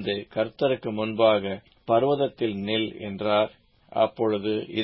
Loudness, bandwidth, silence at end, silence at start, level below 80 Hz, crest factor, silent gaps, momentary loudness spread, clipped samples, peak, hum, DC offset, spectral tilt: -25 LUFS; 5.8 kHz; 0 s; 0 s; -60 dBFS; 18 dB; none; 9 LU; under 0.1%; -6 dBFS; none; under 0.1%; -10 dB/octave